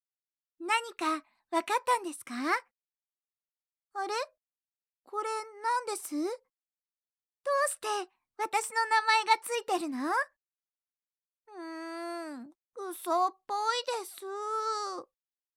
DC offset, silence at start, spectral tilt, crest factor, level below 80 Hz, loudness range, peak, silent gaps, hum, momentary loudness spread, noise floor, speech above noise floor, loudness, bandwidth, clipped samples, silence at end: under 0.1%; 0.6 s; 0 dB/octave; 22 dB; under -90 dBFS; 7 LU; -12 dBFS; 3.05-3.09 s, 3.51-3.55 s, 6.98-7.02 s, 10.69-10.73 s; none; 15 LU; under -90 dBFS; over 58 dB; -32 LUFS; 17 kHz; under 0.1%; 0.55 s